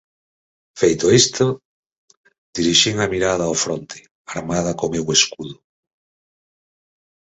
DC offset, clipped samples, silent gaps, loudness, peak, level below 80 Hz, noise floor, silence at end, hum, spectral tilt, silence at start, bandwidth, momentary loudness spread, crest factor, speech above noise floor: under 0.1%; under 0.1%; 1.65-1.90 s, 1.98-2.08 s, 2.17-2.24 s, 2.38-2.53 s, 4.11-4.25 s; -17 LUFS; 0 dBFS; -50 dBFS; under -90 dBFS; 1.85 s; none; -3 dB/octave; 0.75 s; 8.2 kHz; 18 LU; 22 dB; over 72 dB